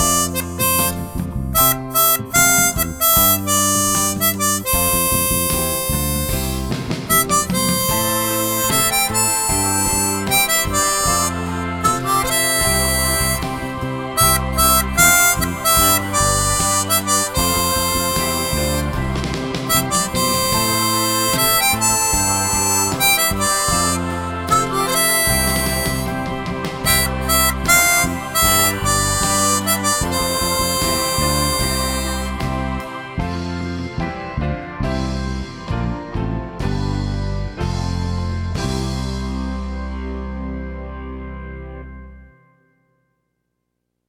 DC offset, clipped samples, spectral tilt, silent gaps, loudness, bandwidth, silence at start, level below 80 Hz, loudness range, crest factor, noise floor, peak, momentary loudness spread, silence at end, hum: under 0.1%; under 0.1%; -2.5 dB/octave; none; -16 LUFS; over 20 kHz; 0 s; -30 dBFS; 10 LU; 18 dB; -74 dBFS; -2 dBFS; 12 LU; 1.8 s; none